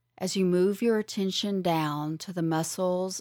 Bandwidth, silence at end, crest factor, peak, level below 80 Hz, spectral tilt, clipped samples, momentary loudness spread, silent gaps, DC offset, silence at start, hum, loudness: 18 kHz; 0 s; 14 dB; -14 dBFS; -72 dBFS; -5 dB/octave; under 0.1%; 7 LU; none; under 0.1%; 0.2 s; none; -28 LUFS